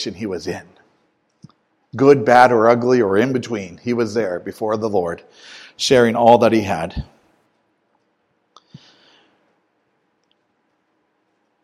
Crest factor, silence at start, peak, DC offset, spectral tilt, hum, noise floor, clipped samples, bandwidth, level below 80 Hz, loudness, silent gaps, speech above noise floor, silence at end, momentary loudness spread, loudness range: 20 dB; 0 s; 0 dBFS; under 0.1%; -5.5 dB/octave; none; -67 dBFS; under 0.1%; 14 kHz; -48 dBFS; -16 LUFS; none; 51 dB; 4.6 s; 21 LU; 5 LU